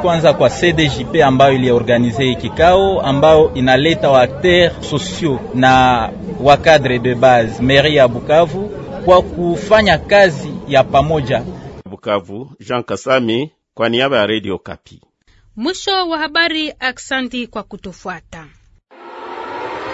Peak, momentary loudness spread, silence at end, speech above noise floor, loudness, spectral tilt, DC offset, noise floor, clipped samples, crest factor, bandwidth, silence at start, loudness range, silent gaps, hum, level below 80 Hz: 0 dBFS; 17 LU; 0 s; 38 dB; -13 LUFS; -5.5 dB/octave; under 0.1%; -52 dBFS; under 0.1%; 14 dB; 8 kHz; 0 s; 7 LU; none; none; -38 dBFS